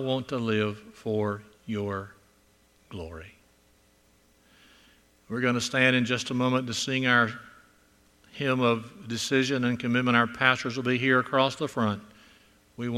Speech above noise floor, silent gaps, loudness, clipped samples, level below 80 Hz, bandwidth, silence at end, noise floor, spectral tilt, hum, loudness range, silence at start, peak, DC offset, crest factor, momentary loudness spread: 36 dB; none; -26 LUFS; under 0.1%; -62 dBFS; 13.5 kHz; 0 s; -63 dBFS; -5 dB/octave; none; 12 LU; 0 s; -4 dBFS; under 0.1%; 24 dB; 15 LU